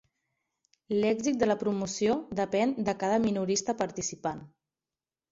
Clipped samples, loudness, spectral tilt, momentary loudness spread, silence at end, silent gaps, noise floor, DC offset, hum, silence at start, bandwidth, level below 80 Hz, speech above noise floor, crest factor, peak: under 0.1%; -29 LUFS; -4.5 dB/octave; 6 LU; 0.85 s; none; under -90 dBFS; under 0.1%; none; 0.9 s; 7.8 kHz; -64 dBFS; over 61 dB; 18 dB; -14 dBFS